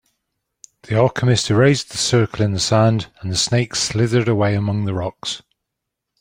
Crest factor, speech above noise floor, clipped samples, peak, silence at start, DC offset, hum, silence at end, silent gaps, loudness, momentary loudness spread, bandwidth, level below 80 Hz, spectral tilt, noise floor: 16 dB; 63 dB; under 0.1%; -2 dBFS; 0.9 s; under 0.1%; none; 0.8 s; none; -18 LUFS; 9 LU; 15.5 kHz; -50 dBFS; -5 dB/octave; -80 dBFS